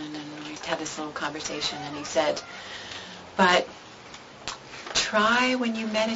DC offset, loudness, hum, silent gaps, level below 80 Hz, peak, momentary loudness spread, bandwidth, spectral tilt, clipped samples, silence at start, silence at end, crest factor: under 0.1%; -26 LUFS; none; none; -60 dBFS; -6 dBFS; 17 LU; 8 kHz; -2.5 dB/octave; under 0.1%; 0 s; 0 s; 22 dB